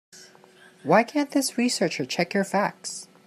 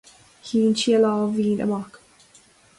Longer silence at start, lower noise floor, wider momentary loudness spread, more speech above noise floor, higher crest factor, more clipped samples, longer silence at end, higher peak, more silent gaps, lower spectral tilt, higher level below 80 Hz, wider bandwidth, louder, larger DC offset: second, 0.15 s vs 0.45 s; about the same, -53 dBFS vs -54 dBFS; second, 12 LU vs 15 LU; second, 29 dB vs 34 dB; first, 20 dB vs 14 dB; neither; second, 0.2 s vs 0.8 s; about the same, -6 dBFS vs -8 dBFS; neither; second, -4 dB/octave vs -5.5 dB/octave; second, -74 dBFS vs -62 dBFS; first, 15 kHz vs 11.5 kHz; second, -24 LUFS vs -21 LUFS; neither